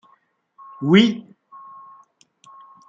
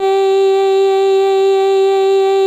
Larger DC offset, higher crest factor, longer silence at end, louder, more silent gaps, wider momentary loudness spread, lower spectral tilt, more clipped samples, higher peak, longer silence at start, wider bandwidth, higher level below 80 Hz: neither; first, 22 dB vs 6 dB; first, 1.7 s vs 0 s; second, -17 LUFS vs -12 LUFS; neither; first, 27 LU vs 0 LU; first, -6.5 dB/octave vs -3 dB/octave; neither; first, -2 dBFS vs -6 dBFS; first, 0.8 s vs 0 s; second, 7.6 kHz vs 8.8 kHz; about the same, -64 dBFS vs -66 dBFS